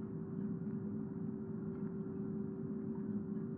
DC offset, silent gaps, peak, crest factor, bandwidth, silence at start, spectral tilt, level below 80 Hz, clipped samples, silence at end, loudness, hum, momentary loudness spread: under 0.1%; none; -30 dBFS; 12 dB; 2.3 kHz; 0 s; -10.5 dB/octave; -72 dBFS; under 0.1%; 0 s; -43 LUFS; none; 2 LU